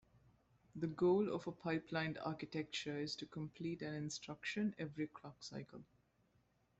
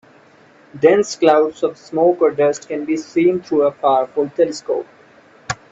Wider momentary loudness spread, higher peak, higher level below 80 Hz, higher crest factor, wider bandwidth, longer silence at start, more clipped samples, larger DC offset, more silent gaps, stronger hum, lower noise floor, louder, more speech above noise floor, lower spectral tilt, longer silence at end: first, 14 LU vs 10 LU; second, -26 dBFS vs 0 dBFS; second, -76 dBFS vs -60 dBFS; about the same, 18 dB vs 18 dB; about the same, 8.2 kHz vs 8 kHz; about the same, 0.75 s vs 0.75 s; neither; neither; neither; neither; first, -77 dBFS vs -48 dBFS; second, -43 LUFS vs -17 LUFS; about the same, 35 dB vs 32 dB; about the same, -5.5 dB/octave vs -5 dB/octave; first, 0.95 s vs 0.2 s